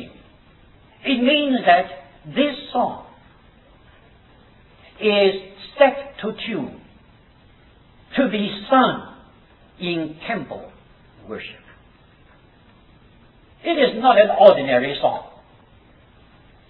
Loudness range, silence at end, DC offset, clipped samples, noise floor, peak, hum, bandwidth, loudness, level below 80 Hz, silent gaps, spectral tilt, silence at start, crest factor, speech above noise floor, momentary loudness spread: 13 LU; 1.45 s; under 0.1%; under 0.1%; -51 dBFS; 0 dBFS; none; 4.9 kHz; -19 LUFS; -56 dBFS; none; -8 dB/octave; 0 s; 22 dB; 33 dB; 19 LU